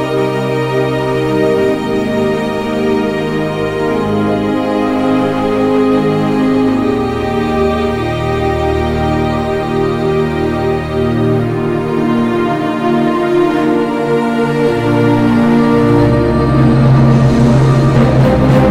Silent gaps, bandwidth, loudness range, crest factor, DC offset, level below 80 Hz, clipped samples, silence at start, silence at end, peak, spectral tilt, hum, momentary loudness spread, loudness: none; 13.5 kHz; 5 LU; 10 dB; under 0.1%; -30 dBFS; under 0.1%; 0 s; 0 s; -2 dBFS; -8 dB/octave; none; 6 LU; -13 LUFS